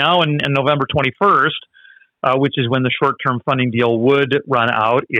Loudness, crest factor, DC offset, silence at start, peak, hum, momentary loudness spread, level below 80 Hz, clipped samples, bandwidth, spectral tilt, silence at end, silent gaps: -16 LUFS; 12 dB; under 0.1%; 0 s; -4 dBFS; none; 4 LU; -56 dBFS; under 0.1%; 7.6 kHz; -7.5 dB/octave; 0 s; none